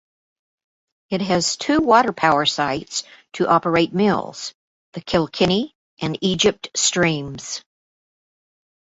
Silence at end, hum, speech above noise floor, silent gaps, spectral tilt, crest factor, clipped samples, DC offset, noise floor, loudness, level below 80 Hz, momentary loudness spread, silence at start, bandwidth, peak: 1.25 s; none; over 70 dB; 4.54-4.92 s, 5.75-5.97 s; -3.5 dB/octave; 20 dB; under 0.1%; under 0.1%; under -90 dBFS; -19 LUFS; -52 dBFS; 15 LU; 1.1 s; 8 kHz; -2 dBFS